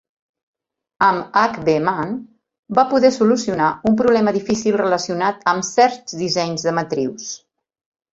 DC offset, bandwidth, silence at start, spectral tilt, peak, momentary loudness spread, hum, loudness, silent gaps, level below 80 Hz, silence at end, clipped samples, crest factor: under 0.1%; 8 kHz; 1 s; -4.5 dB/octave; -2 dBFS; 10 LU; none; -18 LUFS; 2.59-2.63 s; -56 dBFS; 0.75 s; under 0.1%; 18 dB